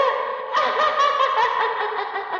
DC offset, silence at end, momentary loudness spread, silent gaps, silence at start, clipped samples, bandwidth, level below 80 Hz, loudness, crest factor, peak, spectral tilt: under 0.1%; 0 s; 7 LU; none; 0 s; under 0.1%; 7.4 kHz; -66 dBFS; -21 LUFS; 14 dB; -8 dBFS; -1 dB/octave